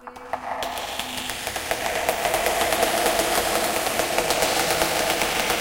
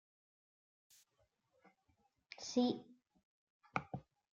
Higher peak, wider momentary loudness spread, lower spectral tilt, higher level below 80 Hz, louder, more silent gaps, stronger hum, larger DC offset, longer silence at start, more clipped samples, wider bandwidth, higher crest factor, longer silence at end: first, -4 dBFS vs -18 dBFS; second, 8 LU vs 16 LU; second, -1.5 dB/octave vs -4.5 dB/octave; first, -46 dBFS vs -80 dBFS; first, -23 LUFS vs -42 LUFS; second, none vs 3.25-3.60 s; neither; neither; second, 0 s vs 2.4 s; neither; first, 17 kHz vs 8.2 kHz; second, 18 dB vs 28 dB; second, 0 s vs 0.3 s